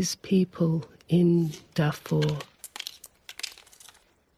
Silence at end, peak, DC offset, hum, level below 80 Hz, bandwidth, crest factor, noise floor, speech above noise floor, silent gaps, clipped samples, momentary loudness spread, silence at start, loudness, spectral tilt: 0.85 s; -12 dBFS; under 0.1%; none; -62 dBFS; 15 kHz; 16 dB; -58 dBFS; 33 dB; none; under 0.1%; 17 LU; 0 s; -27 LUFS; -6 dB/octave